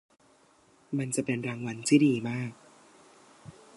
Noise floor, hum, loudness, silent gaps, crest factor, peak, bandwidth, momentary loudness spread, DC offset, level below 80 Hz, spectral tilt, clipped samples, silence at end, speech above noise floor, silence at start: -62 dBFS; none; -29 LUFS; none; 22 dB; -10 dBFS; 11.5 kHz; 13 LU; under 0.1%; -72 dBFS; -5.5 dB/octave; under 0.1%; 0.25 s; 35 dB; 0.9 s